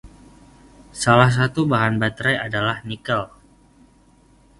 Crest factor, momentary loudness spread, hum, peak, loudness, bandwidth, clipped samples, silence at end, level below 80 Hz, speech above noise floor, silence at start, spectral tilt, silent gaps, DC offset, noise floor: 22 dB; 12 LU; none; 0 dBFS; -19 LUFS; 11.5 kHz; under 0.1%; 1.35 s; -48 dBFS; 35 dB; 0.05 s; -5.5 dB/octave; none; under 0.1%; -54 dBFS